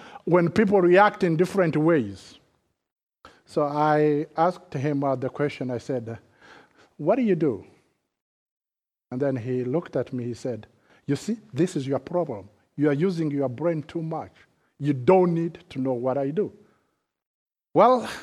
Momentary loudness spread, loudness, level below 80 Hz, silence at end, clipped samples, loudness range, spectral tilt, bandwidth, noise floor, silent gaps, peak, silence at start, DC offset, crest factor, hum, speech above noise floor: 14 LU; -24 LUFS; -66 dBFS; 0 s; under 0.1%; 6 LU; -7.5 dB/octave; 12 kHz; under -90 dBFS; 2.92-2.96 s, 3.03-3.07 s, 8.22-8.61 s, 17.27-17.46 s; -4 dBFS; 0 s; under 0.1%; 22 dB; none; over 67 dB